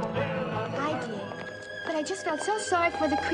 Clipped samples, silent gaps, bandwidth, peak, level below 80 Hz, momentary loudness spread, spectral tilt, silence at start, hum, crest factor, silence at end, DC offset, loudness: under 0.1%; none; 11 kHz; -14 dBFS; -58 dBFS; 11 LU; -4.5 dB/octave; 0 s; none; 16 dB; 0 s; under 0.1%; -30 LUFS